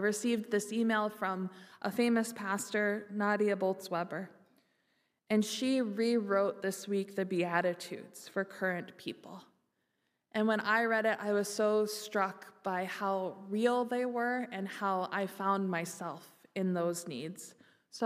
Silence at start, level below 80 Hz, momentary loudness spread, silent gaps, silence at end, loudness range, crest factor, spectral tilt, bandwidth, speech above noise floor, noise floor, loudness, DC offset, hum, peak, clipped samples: 0 s; -86 dBFS; 13 LU; none; 0 s; 4 LU; 20 dB; -4.5 dB/octave; 15.5 kHz; 48 dB; -81 dBFS; -34 LUFS; under 0.1%; none; -14 dBFS; under 0.1%